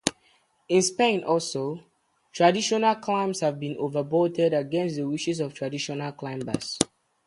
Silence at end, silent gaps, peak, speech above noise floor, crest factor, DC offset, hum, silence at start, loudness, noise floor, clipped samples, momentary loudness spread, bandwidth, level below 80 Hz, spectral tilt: 0.4 s; none; -2 dBFS; 39 dB; 26 dB; under 0.1%; none; 0.05 s; -26 LUFS; -64 dBFS; under 0.1%; 9 LU; 11.5 kHz; -64 dBFS; -4 dB/octave